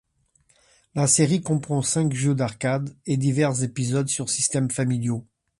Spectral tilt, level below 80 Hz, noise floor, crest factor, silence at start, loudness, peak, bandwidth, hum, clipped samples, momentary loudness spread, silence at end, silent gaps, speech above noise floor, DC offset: -5 dB/octave; -60 dBFS; -64 dBFS; 18 dB; 0.95 s; -23 LUFS; -6 dBFS; 11.5 kHz; none; under 0.1%; 8 LU; 0.35 s; none; 42 dB; under 0.1%